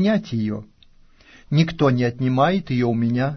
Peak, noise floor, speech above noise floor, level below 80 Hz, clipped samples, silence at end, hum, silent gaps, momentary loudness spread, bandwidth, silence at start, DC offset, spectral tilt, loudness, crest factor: -4 dBFS; -51 dBFS; 31 dB; -48 dBFS; under 0.1%; 0 s; none; none; 7 LU; 6.4 kHz; 0 s; under 0.1%; -8 dB/octave; -21 LUFS; 16 dB